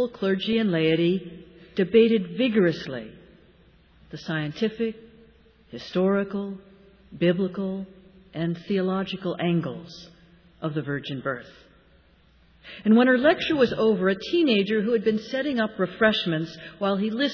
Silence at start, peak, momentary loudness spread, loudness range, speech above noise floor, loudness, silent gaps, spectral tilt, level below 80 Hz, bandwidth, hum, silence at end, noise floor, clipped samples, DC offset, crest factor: 0 s; -6 dBFS; 17 LU; 9 LU; 34 dB; -24 LUFS; none; -7.5 dB/octave; -60 dBFS; 5.4 kHz; none; 0 s; -58 dBFS; under 0.1%; under 0.1%; 18 dB